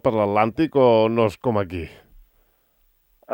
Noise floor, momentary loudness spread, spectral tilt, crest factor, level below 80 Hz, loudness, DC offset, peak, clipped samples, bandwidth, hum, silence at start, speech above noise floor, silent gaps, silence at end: -63 dBFS; 14 LU; -8 dB/octave; 18 dB; -52 dBFS; -20 LUFS; under 0.1%; -4 dBFS; under 0.1%; 16.5 kHz; none; 0.05 s; 44 dB; none; 0 s